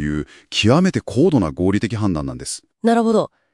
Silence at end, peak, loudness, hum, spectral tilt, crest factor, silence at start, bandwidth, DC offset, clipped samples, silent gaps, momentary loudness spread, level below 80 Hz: 0.25 s; -2 dBFS; -18 LUFS; none; -6 dB/octave; 16 dB; 0 s; 12 kHz; under 0.1%; under 0.1%; none; 11 LU; -42 dBFS